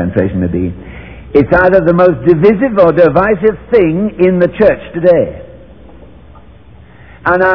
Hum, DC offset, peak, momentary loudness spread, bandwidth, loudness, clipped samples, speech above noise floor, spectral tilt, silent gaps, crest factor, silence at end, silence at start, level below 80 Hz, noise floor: none; 0.8%; 0 dBFS; 11 LU; 5.4 kHz; -10 LUFS; 1%; 28 dB; -10.5 dB/octave; none; 12 dB; 0 s; 0 s; -34 dBFS; -38 dBFS